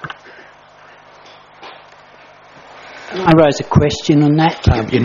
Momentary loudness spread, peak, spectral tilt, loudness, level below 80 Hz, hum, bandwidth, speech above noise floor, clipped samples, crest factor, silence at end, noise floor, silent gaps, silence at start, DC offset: 25 LU; 0 dBFS; -6 dB/octave; -13 LUFS; -34 dBFS; 50 Hz at -45 dBFS; 7.4 kHz; 31 dB; 0.1%; 16 dB; 0 s; -43 dBFS; none; 0 s; under 0.1%